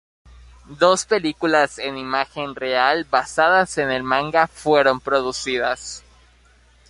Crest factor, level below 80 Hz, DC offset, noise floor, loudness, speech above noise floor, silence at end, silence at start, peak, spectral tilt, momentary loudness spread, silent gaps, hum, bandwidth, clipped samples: 20 dB; -52 dBFS; under 0.1%; -54 dBFS; -19 LUFS; 34 dB; 0.9 s; 0.7 s; -2 dBFS; -3 dB/octave; 9 LU; none; none; 11.5 kHz; under 0.1%